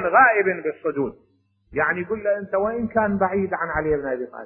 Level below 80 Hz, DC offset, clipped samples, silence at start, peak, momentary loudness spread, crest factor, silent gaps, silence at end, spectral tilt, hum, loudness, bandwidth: -48 dBFS; under 0.1%; under 0.1%; 0 s; -4 dBFS; 11 LU; 18 dB; none; 0 s; -12 dB/octave; none; -22 LUFS; 3.1 kHz